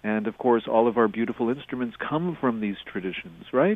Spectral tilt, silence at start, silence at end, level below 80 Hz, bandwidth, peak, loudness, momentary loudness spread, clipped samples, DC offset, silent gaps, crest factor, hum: -9 dB/octave; 0.05 s; 0 s; -62 dBFS; 3.9 kHz; -6 dBFS; -26 LUFS; 10 LU; under 0.1%; under 0.1%; none; 20 dB; none